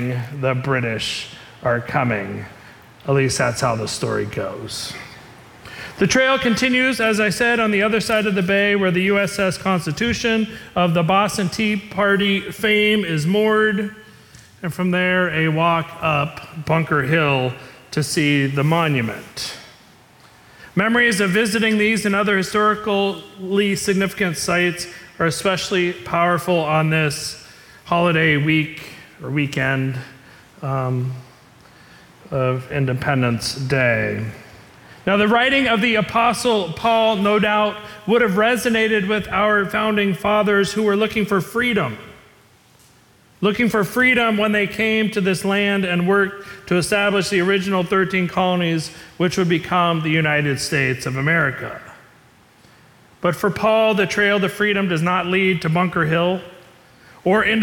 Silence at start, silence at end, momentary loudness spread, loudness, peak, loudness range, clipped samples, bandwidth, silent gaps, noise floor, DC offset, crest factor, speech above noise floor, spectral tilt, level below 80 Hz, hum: 0 s; 0 s; 11 LU; -18 LUFS; -6 dBFS; 4 LU; under 0.1%; 18 kHz; none; -52 dBFS; under 0.1%; 14 dB; 34 dB; -5 dB/octave; -52 dBFS; none